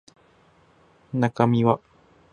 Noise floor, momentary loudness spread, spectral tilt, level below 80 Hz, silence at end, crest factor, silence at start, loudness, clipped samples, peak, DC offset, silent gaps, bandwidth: -58 dBFS; 9 LU; -8.5 dB/octave; -60 dBFS; 0.55 s; 22 dB; 1.15 s; -23 LUFS; under 0.1%; -4 dBFS; under 0.1%; none; 9.6 kHz